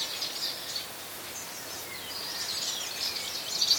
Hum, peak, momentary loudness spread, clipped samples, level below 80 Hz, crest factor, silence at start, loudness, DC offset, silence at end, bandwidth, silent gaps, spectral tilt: none; -10 dBFS; 7 LU; under 0.1%; -68 dBFS; 22 dB; 0 s; -32 LUFS; under 0.1%; 0 s; over 20 kHz; none; 0.5 dB/octave